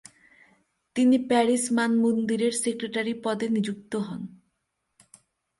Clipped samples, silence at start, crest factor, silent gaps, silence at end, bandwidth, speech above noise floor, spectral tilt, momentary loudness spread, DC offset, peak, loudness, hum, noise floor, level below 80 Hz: under 0.1%; 0.95 s; 18 dB; none; 1.25 s; 11.5 kHz; 54 dB; -4.5 dB/octave; 11 LU; under 0.1%; -8 dBFS; -25 LUFS; none; -78 dBFS; -70 dBFS